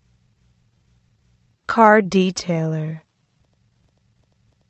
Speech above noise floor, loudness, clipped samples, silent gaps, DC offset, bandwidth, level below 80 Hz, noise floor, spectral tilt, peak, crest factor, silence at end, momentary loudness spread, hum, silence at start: 47 dB; -17 LUFS; under 0.1%; none; under 0.1%; 8.4 kHz; -60 dBFS; -64 dBFS; -6 dB/octave; 0 dBFS; 22 dB; 1.7 s; 20 LU; none; 1.7 s